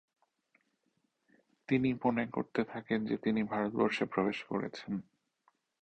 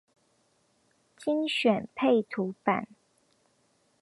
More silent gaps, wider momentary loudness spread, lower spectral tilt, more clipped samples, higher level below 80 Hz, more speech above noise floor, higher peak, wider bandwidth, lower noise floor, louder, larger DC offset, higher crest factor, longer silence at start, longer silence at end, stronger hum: neither; about the same, 8 LU vs 8 LU; about the same, -7 dB/octave vs -6 dB/octave; neither; first, -70 dBFS vs -76 dBFS; first, 46 dB vs 42 dB; second, -16 dBFS vs -8 dBFS; second, 8.8 kHz vs 11.5 kHz; first, -79 dBFS vs -70 dBFS; second, -34 LUFS vs -28 LUFS; neither; about the same, 20 dB vs 22 dB; first, 1.7 s vs 1.2 s; second, 0.8 s vs 1.15 s; neither